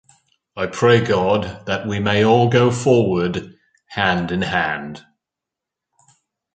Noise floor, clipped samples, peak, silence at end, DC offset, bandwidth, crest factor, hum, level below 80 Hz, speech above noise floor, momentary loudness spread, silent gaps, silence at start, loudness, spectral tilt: -85 dBFS; under 0.1%; -2 dBFS; 1.55 s; under 0.1%; 9.2 kHz; 18 dB; none; -48 dBFS; 68 dB; 13 LU; none; 0.55 s; -18 LUFS; -6 dB/octave